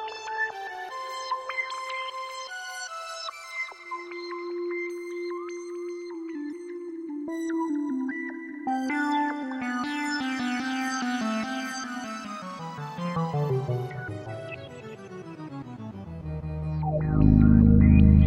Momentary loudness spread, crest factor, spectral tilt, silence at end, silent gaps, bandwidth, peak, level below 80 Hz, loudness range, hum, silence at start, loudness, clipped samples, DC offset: 15 LU; 22 dB; -6.5 dB/octave; 0 s; none; 11.5 kHz; -6 dBFS; -34 dBFS; 7 LU; none; 0 s; -28 LUFS; under 0.1%; under 0.1%